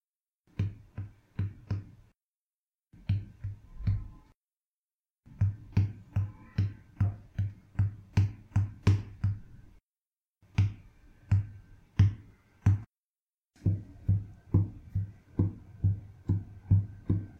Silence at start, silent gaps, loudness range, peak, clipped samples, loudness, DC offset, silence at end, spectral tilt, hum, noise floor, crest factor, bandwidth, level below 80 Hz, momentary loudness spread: 0.6 s; 2.28-2.72 s, 4.36-4.42 s, 4.66-4.84 s, 4.94-5.04 s, 5.11-5.23 s, 9.84-9.88 s, 12.97-13.27 s, 13.34-13.41 s; 7 LU; -12 dBFS; under 0.1%; -33 LUFS; under 0.1%; 0.05 s; -8.5 dB/octave; none; under -90 dBFS; 20 dB; 6.6 kHz; -48 dBFS; 13 LU